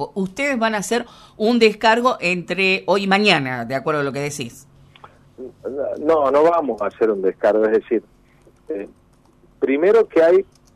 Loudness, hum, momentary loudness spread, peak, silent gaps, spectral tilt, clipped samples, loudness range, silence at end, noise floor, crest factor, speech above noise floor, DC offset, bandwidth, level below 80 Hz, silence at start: -18 LUFS; none; 16 LU; 0 dBFS; none; -4.5 dB/octave; under 0.1%; 4 LU; 0.3 s; -53 dBFS; 18 dB; 35 dB; under 0.1%; 13 kHz; -58 dBFS; 0 s